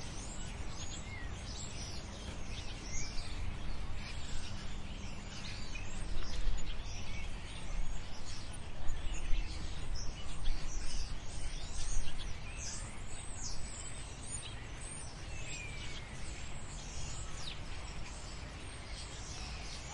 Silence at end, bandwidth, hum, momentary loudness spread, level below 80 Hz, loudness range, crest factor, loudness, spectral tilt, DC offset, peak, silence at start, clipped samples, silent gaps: 0 s; 10.5 kHz; none; 4 LU; -42 dBFS; 1 LU; 18 dB; -44 LUFS; -3 dB/octave; under 0.1%; -16 dBFS; 0 s; under 0.1%; none